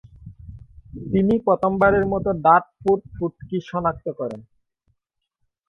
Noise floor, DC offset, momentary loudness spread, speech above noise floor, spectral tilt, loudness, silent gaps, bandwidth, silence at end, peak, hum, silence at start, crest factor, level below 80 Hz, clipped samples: -78 dBFS; under 0.1%; 16 LU; 57 dB; -9.5 dB/octave; -21 LUFS; none; 6.4 kHz; 1.25 s; -2 dBFS; none; 0.2 s; 22 dB; -46 dBFS; under 0.1%